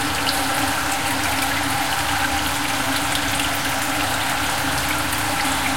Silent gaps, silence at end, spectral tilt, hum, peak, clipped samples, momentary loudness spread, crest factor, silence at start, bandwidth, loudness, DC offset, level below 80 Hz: none; 0 s; -2 dB/octave; none; -6 dBFS; under 0.1%; 1 LU; 16 dB; 0 s; 17 kHz; -20 LUFS; 2%; -40 dBFS